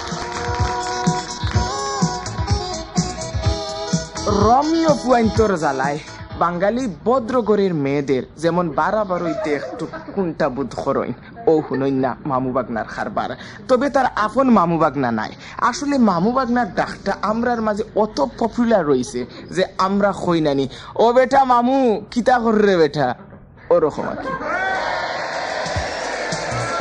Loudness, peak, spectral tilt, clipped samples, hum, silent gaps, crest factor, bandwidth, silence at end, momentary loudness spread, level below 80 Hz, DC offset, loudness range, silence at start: -19 LUFS; -4 dBFS; -5.5 dB/octave; under 0.1%; none; none; 16 dB; 10.5 kHz; 0 s; 9 LU; -38 dBFS; under 0.1%; 5 LU; 0 s